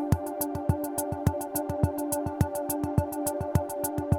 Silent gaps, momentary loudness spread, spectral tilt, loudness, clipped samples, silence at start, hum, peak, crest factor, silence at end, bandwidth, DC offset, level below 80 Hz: none; 3 LU; -6.5 dB/octave; -30 LUFS; under 0.1%; 0 s; none; -10 dBFS; 20 dB; 0 s; 19.5 kHz; under 0.1%; -42 dBFS